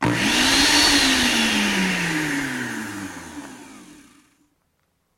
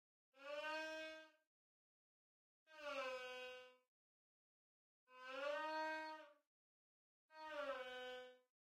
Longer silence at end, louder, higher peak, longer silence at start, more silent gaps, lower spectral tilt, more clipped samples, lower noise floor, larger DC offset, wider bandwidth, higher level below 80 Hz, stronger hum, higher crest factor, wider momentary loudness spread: first, 1.25 s vs 0.4 s; first, -18 LUFS vs -50 LUFS; first, -4 dBFS vs -36 dBFS; second, 0 s vs 0.35 s; second, none vs 1.47-2.66 s, 3.88-5.07 s, 6.47-7.29 s; about the same, -2 dB/octave vs -1 dB/octave; neither; second, -69 dBFS vs under -90 dBFS; neither; about the same, 16.5 kHz vs 15 kHz; first, -44 dBFS vs under -90 dBFS; neither; about the same, 18 dB vs 18 dB; about the same, 21 LU vs 20 LU